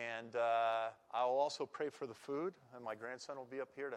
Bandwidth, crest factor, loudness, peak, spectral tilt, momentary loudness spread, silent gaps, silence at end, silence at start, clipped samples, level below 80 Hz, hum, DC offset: 12 kHz; 16 dB; -40 LUFS; -24 dBFS; -4 dB/octave; 12 LU; none; 0 s; 0 s; under 0.1%; under -90 dBFS; none; under 0.1%